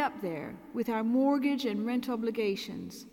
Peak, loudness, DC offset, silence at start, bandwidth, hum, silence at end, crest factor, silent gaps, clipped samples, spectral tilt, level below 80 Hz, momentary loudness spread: -16 dBFS; -31 LUFS; under 0.1%; 0 s; 17 kHz; none; 0.05 s; 14 dB; none; under 0.1%; -5.5 dB/octave; -70 dBFS; 12 LU